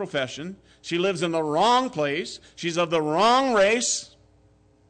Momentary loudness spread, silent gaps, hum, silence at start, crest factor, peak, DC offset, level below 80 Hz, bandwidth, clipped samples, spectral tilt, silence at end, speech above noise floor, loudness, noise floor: 13 LU; none; none; 0 s; 12 dB; -12 dBFS; under 0.1%; -62 dBFS; 9.4 kHz; under 0.1%; -3.5 dB/octave; 0.85 s; 35 dB; -23 LUFS; -59 dBFS